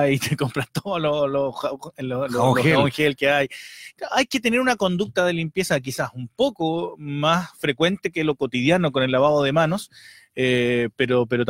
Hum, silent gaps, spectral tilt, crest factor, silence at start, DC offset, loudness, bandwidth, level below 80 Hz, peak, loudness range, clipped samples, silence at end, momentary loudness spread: none; none; -5.5 dB/octave; 18 dB; 0 s; under 0.1%; -22 LUFS; 16.5 kHz; -56 dBFS; -4 dBFS; 2 LU; under 0.1%; 0 s; 11 LU